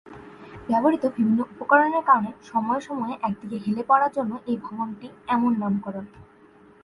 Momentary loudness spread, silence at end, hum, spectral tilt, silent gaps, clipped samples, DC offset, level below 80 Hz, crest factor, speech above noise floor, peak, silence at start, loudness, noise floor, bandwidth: 18 LU; 0.6 s; none; -7.5 dB/octave; none; under 0.1%; under 0.1%; -62 dBFS; 20 dB; 29 dB; -4 dBFS; 0.05 s; -24 LUFS; -52 dBFS; 11 kHz